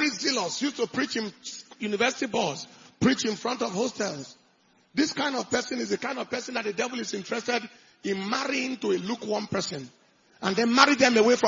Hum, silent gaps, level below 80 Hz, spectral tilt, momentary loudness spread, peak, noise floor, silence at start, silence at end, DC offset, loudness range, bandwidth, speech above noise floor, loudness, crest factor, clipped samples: none; none; -70 dBFS; -3.5 dB/octave; 15 LU; -4 dBFS; -64 dBFS; 0 s; 0 s; under 0.1%; 4 LU; 7.6 kHz; 37 dB; -27 LUFS; 24 dB; under 0.1%